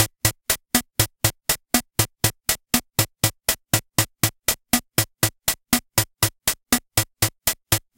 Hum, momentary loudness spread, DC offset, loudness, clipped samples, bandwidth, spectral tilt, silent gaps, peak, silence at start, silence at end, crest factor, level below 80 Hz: none; 4 LU; under 0.1%; -22 LUFS; under 0.1%; 17.5 kHz; -2.5 dB/octave; none; 0 dBFS; 0 s; 0.2 s; 24 dB; -42 dBFS